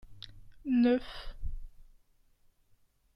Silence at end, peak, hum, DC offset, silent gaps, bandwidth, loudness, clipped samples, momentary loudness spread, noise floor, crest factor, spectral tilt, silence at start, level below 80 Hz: 1.35 s; -16 dBFS; none; under 0.1%; none; 5.8 kHz; -29 LUFS; under 0.1%; 24 LU; -67 dBFS; 18 dB; -7.5 dB/octave; 0.05 s; -46 dBFS